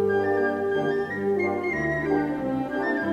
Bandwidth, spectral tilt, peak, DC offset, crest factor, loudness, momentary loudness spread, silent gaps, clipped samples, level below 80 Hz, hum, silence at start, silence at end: 8 kHz; -7.5 dB/octave; -12 dBFS; under 0.1%; 12 dB; -25 LUFS; 3 LU; none; under 0.1%; -52 dBFS; 50 Hz at -40 dBFS; 0 s; 0 s